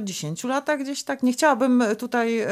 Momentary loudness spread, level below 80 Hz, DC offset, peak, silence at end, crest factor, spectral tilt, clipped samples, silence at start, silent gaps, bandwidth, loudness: 8 LU; -76 dBFS; under 0.1%; -6 dBFS; 0 s; 18 dB; -4 dB/octave; under 0.1%; 0 s; none; 15.5 kHz; -23 LUFS